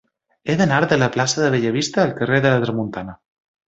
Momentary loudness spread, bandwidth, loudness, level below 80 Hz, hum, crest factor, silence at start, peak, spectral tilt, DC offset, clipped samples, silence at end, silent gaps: 12 LU; 8.2 kHz; -18 LUFS; -54 dBFS; none; 18 dB; 0.45 s; -2 dBFS; -5 dB/octave; under 0.1%; under 0.1%; 0.55 s; none